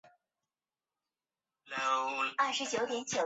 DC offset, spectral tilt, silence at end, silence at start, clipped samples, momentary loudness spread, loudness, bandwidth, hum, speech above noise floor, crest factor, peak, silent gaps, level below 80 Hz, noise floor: under 0.1%; 0 dB/octave; 0 s; 0.05 s; under 0.1%; 4 LU; -33 LUFS; 8 kHz; none; over 57 dB; 20 dB; -18 dBFS; none; -82 dBFS; under -90 dBFS